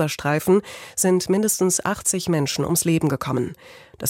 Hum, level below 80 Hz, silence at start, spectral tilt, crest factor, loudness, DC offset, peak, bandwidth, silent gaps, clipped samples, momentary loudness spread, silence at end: none; -54 dBFS; 0 s; -4.5 dB/octave; 14 dB; -21 LUFS; under 0.1%; -8 dBFS; 16.5 kHz; none; under 0.1%; 6 LU; 0 s